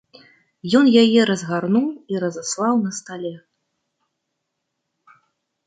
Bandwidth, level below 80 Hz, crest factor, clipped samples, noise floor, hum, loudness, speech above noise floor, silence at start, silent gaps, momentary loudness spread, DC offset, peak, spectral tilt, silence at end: 9.4 kHz; -68 dBFS; 18 dB; under 0.1%; -77 dBFS; none; -18 LUFS; 59 dB; 0.65 s; none; 17 LU; under 0.1%; -2 dBFS; -5 dB/octave; 2.3 s